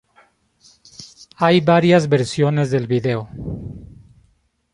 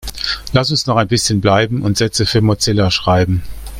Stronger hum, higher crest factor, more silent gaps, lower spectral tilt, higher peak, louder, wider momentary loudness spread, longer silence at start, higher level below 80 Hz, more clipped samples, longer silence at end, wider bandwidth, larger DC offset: neither; about the same, 18 dB vs 14 dB; neither; first, -6.5 dB/octave vs -4.5 dB/octave; about the same, -2 dBFS vs 0 dBFS; second, -17 LUFS vs -14 LUFS; first, 25 LU vs 4 LU; first, 1 s vs 0 s; second, -48 dBFS vs -34 dBFS; neither; first, 0.9 s vs 0 s; second, 11 kHz vs 16 kHz; neither